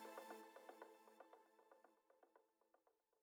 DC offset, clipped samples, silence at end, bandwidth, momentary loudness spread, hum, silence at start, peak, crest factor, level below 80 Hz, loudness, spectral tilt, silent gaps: under 0.1%; under 0.1%; 0.25 s; over 20 kHz; 10 LU; none; 0 s; -42 dBFS; 22 dB; under -90 dBFS; -62 LUFS; -2.5 dB/octave; none